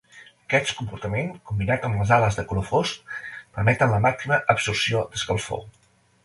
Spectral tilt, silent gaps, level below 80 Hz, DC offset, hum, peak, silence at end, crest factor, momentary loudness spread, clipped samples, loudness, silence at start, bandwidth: -5 dB/octave; none; -46 dBFS; under 0.1%; none; -2 dBFS; 0.55 s; 22 dB; 12 LU; under 0.1%; -23 LUFS; 0.15 s; 11.5 kHz